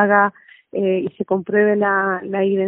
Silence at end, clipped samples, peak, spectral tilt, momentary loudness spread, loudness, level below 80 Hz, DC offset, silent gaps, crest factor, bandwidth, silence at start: 0 s; under 0.1%; 0 dBFS; -1 dB/octave; 7 LU; -19 LUFS; -64 dBFS; under 0.1%; none; 18 dB; 3.6 kHz; 0 s